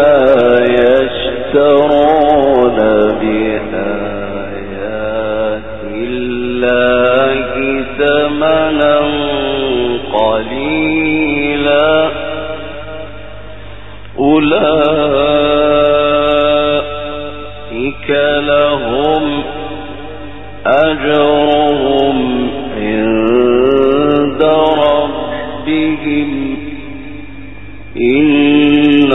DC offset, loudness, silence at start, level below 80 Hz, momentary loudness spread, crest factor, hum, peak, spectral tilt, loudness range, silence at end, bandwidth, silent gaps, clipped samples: 3%; -12 LUFS; 0 s; -36 dBFS; 17 LU; 12 dB; none; 0 dBFS; -8 dB/octave; 4 LU; 0 s; 4 kHz; none; under 0.1%